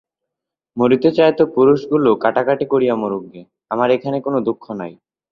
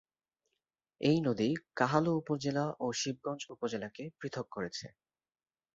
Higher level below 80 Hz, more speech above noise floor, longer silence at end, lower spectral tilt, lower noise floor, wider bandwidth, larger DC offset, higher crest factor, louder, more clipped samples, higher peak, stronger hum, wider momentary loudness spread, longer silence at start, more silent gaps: first, -58 dBFS vs -72 dBFS; first, 67 dB vs 54 dB; second, 0.4 s vs 0.9 s; first, -8.5 dB/octave vs -5.5 dB/octave; second, -83 dBFS vs -88 dBFS; second, 6.2 kHz vs 8 kHz; neither; second, 16 dB vs 22 dB; first, -16 LUFS vs -34 LUFS; neither; first, -2 dBFS vs -12 dBFS; neither; first, 14 LU vs 11 LU; second, 0.75 s vs 1 s; neither